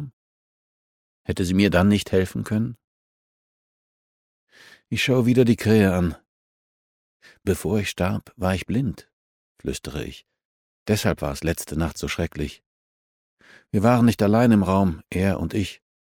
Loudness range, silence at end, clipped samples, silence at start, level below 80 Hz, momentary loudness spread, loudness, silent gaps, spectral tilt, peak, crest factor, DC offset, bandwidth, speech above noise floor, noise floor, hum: 6 LU; 0.4 s; under 0.1%; 0 s; -44 dBFS; 14 LU; -22 LUFS; 0.13-1.25 s, 2.84-4.47 s, 6.28-7.20 s, 9.13-9.55 s, 10.45-10.86 s, 12.66-13.37 s; -6.5 dB/octave; -4 dBFS; 20 dB; under 0.1%; 17 kHz; over 69 dB; under -90 dBFS; none